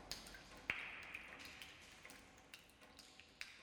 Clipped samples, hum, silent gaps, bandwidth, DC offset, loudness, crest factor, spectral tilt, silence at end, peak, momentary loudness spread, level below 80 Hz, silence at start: under 0.1%; none; none; over 20 kHz; under 0.1%; -52 LUFS; 32 dB; -1.5 dB/octave; 0 s; -22 dBFS; 15 LU; -72 dBFS; 0 s